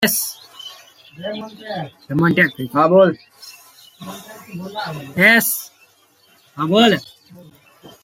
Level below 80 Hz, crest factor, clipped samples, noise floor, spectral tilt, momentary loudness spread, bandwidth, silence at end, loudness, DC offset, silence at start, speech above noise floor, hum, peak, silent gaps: -62 dBFS; 18 dB; under 0.1%; -55 dBFS; -4 dB/octave; 23 LU; 16.5 kHz; 0.15 s; -16 LUFS; under 0.1%; 0 s; 37 dB; none; 0 dBFS; none